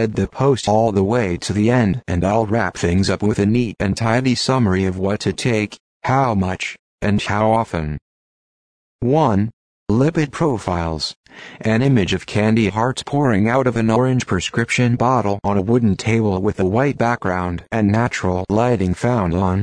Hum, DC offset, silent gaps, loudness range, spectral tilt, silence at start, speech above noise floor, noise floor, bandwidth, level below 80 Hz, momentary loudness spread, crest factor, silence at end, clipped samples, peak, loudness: none; under 0.1%; 5.80-6.00 s, 6.79-6.98 s, 8.02-8.99 s, 9.53-9.86 s, 11.16-11.24 s; 3 LU; -6.5 dB/octave; 0 s; over 73 dB; under -90 dBFS; 10.5 kHz; -42 dBFS; 7 LU; 14 dB; 0 s; under 0.1%; -2 dBFS; -18 LUFS